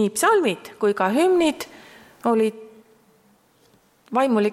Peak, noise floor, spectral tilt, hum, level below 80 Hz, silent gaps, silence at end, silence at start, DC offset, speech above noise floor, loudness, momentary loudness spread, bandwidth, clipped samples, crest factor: -8 dBFS; -59 dBFS; -4.5 dB/octave; none; -64 dBFS; none; 0 s; 0 s; under 0.1%; 39 dB; -21 LUFS; 9 LU; 15.5 kHz; under 0.1%; 16 dB